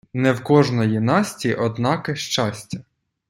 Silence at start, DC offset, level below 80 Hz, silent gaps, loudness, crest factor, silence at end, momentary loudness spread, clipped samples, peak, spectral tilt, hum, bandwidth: 0.15 s; under 0.1%; -58 dBFS; none; -20 LUFS; 18 dB; 0.5 s; 11 LU; under 0.1%; -2 dBFS; -5.5 dB/octave; none; 16 kHz